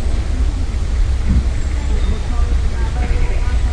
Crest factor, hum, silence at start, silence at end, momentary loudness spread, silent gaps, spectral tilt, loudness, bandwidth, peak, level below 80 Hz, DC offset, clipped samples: 12 dB; none; 0 s; 0 s; 3 LU; none; -6.5 dB/octave; -20 LUFS; 10 kHz; -2 dBFS; -16 dBFS; under 0.1%; under 0.1%